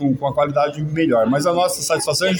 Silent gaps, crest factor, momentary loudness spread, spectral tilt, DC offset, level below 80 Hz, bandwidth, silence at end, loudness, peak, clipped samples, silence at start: none; 12 dB; 4 LU; -4.5 dB/octave; under 0.1%; -54 dBFS; 17.5 kHz; 0 s; -18 LUFS; -6 dBFS; under 0.1%; 0 s